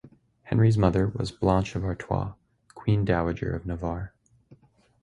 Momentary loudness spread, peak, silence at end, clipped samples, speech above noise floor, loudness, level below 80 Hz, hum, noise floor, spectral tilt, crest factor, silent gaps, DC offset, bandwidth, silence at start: 11 LU; -6 dBFS; 0.5 s; under 0.1%; 33 dB; -27 LUFS; -42 dBFS; none; -57 dBFS; -8 dB/octave; 22 dB; none; under 0.1%; 10.5 kHz; 0.05 s